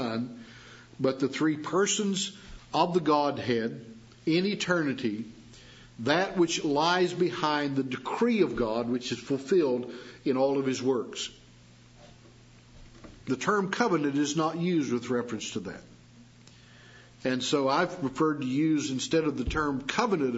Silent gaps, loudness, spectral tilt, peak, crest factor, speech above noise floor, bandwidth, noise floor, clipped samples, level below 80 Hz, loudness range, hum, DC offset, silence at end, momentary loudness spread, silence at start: none; -28 LUFS; -4.5 dB/octave; -8 dBFS; 20 dB; 27 dB; 8 kHz; -54 dBFS; under 0.1%; -54 dBFS; 5 LU; none; under 0.1%; 0 s; 11 LU; 0 s